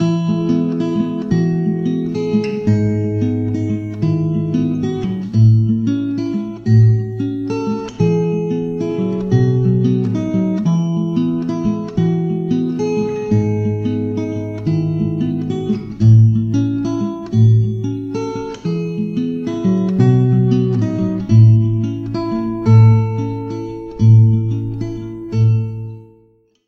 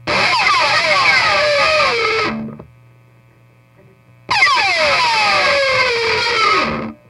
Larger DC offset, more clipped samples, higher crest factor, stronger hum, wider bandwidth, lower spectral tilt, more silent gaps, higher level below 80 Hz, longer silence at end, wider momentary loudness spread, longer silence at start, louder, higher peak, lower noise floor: neither; neither; about the same, 16 dB vs 14 dB; neither; second, 6.8 kHz vs 13.5 kHz; first, -9.5 dB/octave vs -2 dB/octave; neither; about the same, -44 dBFS vs -48 dBFS; first, 0.65 s vs 0.15 s; first, 10 LU vs 7 LU; about the same, 0 s vs 0.05 s; second, -16 LUFS vs -13 LUFS; about the same, 0 dBFS vs -2 dBFS; first, -53 dBFS vs -49 dBFS